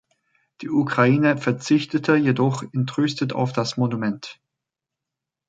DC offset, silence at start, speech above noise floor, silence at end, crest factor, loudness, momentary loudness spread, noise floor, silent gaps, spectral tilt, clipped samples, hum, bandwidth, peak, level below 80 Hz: under 0.1%; 0.6 s; 65 dB; 1.15 s; 18 dB; -21 LUFS; 8 LU; -86 dBFS; none; -6.5 dB/octave; under 0.1%; none; 9 kHz; -4 dBFS; -64 dBFS